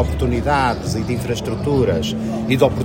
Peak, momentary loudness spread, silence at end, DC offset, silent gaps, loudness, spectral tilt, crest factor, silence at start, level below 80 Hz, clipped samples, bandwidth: 0 dBFS; 6 LU; 0 s; under 0.1%; none; -19 LUFS; -6.5 dB/octave; 18 dB; 0 s; -32 dBFS; under 0.1%; 16.5 kHz